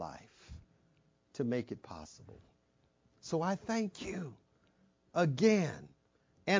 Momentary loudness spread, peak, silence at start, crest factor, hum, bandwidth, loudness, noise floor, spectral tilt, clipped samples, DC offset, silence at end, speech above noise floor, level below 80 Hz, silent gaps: 26 LU; -16 dBFS; 0 s; 22 dB; none; 7.6 kHz; -35 LUFS; -73 dBFS; -6 dB/octave; under 0.1%; under 0.1%; 0 s; 39 dB; -66 dBFS; none